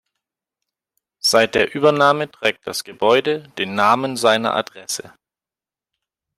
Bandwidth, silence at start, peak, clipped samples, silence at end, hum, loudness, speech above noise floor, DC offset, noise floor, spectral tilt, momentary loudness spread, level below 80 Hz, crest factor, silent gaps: 15.5 kHz; 1.25 s; -2 dBFS; under 0.1%; 1.3 s; none; -18 LUFS; over 72 dB; under 0.1%; under -90 dBFS; -3 dB/octave; 12 LU; -60 dBFS; 18 dB; none